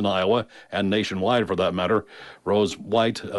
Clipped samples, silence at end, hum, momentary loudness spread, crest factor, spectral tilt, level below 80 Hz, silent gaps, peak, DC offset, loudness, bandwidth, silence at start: under 0.1%; 0 s; none; 6 LU; 14 dB; -5.5 dB/octave; -58 dBFS; none; -10 dBFS; under 0.1%; -23 LUFS; 11.5 kHz; 0 s